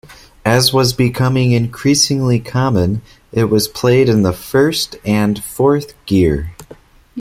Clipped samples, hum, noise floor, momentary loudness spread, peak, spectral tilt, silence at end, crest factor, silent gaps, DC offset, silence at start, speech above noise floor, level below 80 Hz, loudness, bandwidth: under 0.1%; none; -42 dBFS; 8 LU; 0 dBFS; -5 dB/octave; 0 s; 14 dB; none; under 0.1%; 0.1 s; 28 dB; -38 dBFS; -14 LUFS; 16.5 kHz